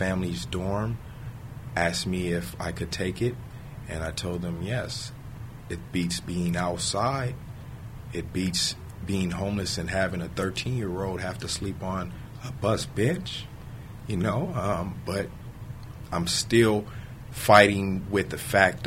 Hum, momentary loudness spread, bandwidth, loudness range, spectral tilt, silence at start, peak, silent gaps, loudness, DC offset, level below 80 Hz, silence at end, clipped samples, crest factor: none; 19 LU; 16 kHz; 8 LU; -4.5 dB/octave; 0 s; -2 dBFS; none; -27 LUFS; under 0.1%; -46 dBFS; 0 s; under 0.1%; 26 dB